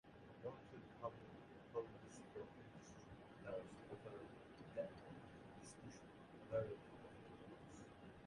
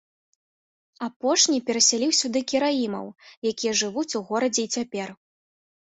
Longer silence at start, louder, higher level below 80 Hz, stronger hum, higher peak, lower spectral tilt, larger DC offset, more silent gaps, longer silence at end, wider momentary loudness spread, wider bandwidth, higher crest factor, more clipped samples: second, 0.05 s vs 1 s; second, -55 LUFS vs -23 LUFS; second, -76 dBFS vs -70 dBFS; neither; second, -32 dBFS vs -6 dBFS; first, -6 dB/octave vs -1.5 dB/octave; neither; second, none vs 1.16-1.20 s, 3.37-3.42 s; second, 0 s vs 0.8 s; second, 10 LU vs 15 LU; first, 11 kHz vs 8.4 kHz; about the same, 22 dB vs 20 dB; neither